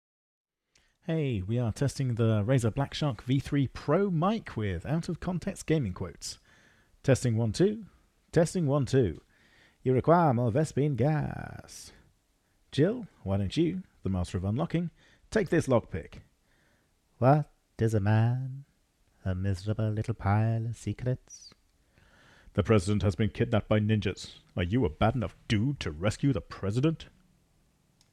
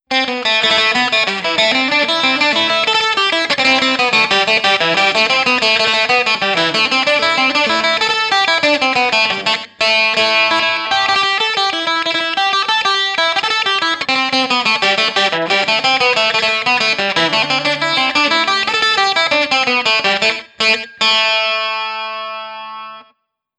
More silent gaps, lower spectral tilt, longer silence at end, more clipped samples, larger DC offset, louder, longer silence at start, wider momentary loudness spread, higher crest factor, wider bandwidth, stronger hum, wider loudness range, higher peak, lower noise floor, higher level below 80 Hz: neither; first, -7 dB/octave vs -1.5 dB/octave; first, 1.05 s vs 0.55 s; neither; neither; second, -29 LUFS vs -13 LUFS; first, 1.05 s vs 0.1 s; first, 14 LU vs 4 LU; first, 20 dB vs 14 dB; about the same, 12.5 kHz vs 11.5 kHz; neither; about the same, 4 LU vs 2 LU; second, -10 dBFS vs 0 dBFS; first, -70 dBFS vs -61 dBFS; first, -52 dBFS vs -60 dBFS